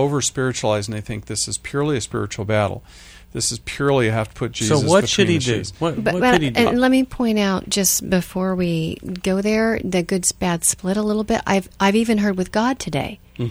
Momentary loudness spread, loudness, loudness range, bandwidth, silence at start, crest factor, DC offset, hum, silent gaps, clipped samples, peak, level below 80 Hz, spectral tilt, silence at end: 9 LU; -19 LUFS; 5 LU; over 20 kHz; 0 s; 20 dB; under 0.1%; none; none; under 0.1%; 0 dBFS; -44 dBFS; -4.5 dB/octave; 0 s